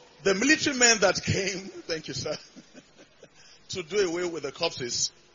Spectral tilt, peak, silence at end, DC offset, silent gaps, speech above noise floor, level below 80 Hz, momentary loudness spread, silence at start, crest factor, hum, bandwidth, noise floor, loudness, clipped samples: -2.5 dB/octave; -6 dBFS; 0.25 s; under 0.1%; none; 28 dB; -60 dBFS; 16 LU; 0.2 s; 22 dB; none; 7.6 kHz; -54 dBFS; -26 LUFS; under 0.1%